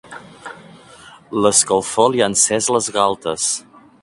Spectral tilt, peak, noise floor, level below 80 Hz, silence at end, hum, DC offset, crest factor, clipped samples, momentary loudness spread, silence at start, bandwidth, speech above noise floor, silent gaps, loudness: -2.5 dB/octave; 0 dBFS; -43 dBFS; -56 dBFS; 0.4 s; none; under 0.1%; 18 dB; under 0.1%; 22 LU; 0.1 s; 11.5 kHz; 26 dB; none; -16 LUFS